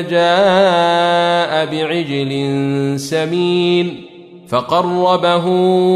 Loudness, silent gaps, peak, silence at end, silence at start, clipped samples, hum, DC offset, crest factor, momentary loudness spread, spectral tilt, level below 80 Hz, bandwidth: -14 LUFS; none; -2 dBFS; 0 s; 0 s; under 0.1%; none; under 0.1%; 14 dB; 7 LU; -5.5 dB/octave; -58 dBFS; 13 kHz